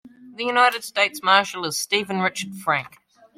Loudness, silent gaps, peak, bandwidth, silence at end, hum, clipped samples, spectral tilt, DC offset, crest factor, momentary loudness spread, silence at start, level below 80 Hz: -21 LUFS; none; -4 dBFS; 16.5 kHz; 0.5 s; none; under 0.1%; -2.5 dB/octave; under 0.1%; 20 dB; 8 LU; 0.05 s; -70 dBFS